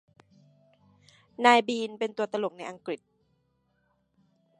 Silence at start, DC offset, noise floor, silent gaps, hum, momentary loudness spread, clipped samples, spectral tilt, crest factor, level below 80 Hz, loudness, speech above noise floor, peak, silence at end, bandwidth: 1.4 s; under 0.1%; -72 dBFS; none; none; 17 LU; under 0.1%; -3.5 dB/octave; 26 dB; -82 dBFS; -27 LUFS; 46 dB; -4 dBFS; 1.65 s; 11.5 kHz